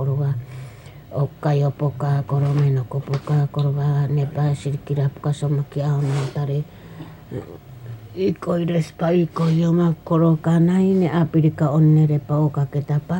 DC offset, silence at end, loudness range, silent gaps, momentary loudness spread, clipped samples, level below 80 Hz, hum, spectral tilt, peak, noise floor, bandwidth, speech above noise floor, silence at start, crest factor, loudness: under 0.1%; 0 s; 7 LU; none; 17 LU; under 0.1%; -52 dBFS; none; -9 dB/octave; -8 dBFS; -39 dBFS; 16 kHz; 20 dB; 0 s; 12 dB; -20 LUFS